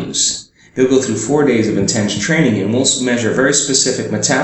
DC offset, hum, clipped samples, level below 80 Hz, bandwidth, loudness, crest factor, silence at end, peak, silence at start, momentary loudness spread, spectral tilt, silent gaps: under 0.1%; none; under 0.1%; -50 dBFS; 8.6 kHz; -14 LUFS; 14 dB; 0 s; 0 dBFS; 0 s; 4 LU; -3.5 dB/octave; none